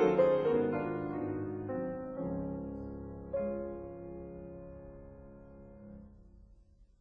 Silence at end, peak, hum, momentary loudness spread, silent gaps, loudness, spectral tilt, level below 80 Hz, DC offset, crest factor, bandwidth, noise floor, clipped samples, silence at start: 0.15 s; -16 dBFS; none; 23 LU; none; -36 LUFS; -9 dB/octave; -56 dBFS; under 0.1%; 20 dB; 6.2 kHz; -61 dBFS; under 0.1%; 0 s